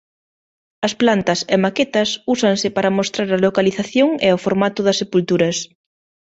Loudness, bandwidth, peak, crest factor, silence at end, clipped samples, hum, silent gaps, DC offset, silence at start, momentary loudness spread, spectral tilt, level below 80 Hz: -17 LUFS; 8.2 kHz; 0 dBFS; 18 dB; 0.65 s; under 0.1%; none; none; under 0.1%; 0.8 s; 4 LU; -4.5 dB/octave; -56 dBFS